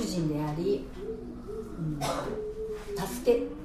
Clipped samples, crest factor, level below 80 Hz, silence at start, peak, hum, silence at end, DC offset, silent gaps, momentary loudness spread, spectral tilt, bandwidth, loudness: under 0.1%; 20 dB; -46 dBFS; 0 s; -12 dBFS; none; 0 s; under 0.1%; none; 12 LU; -6 dB/octave; 15 kHz; -32 LUFS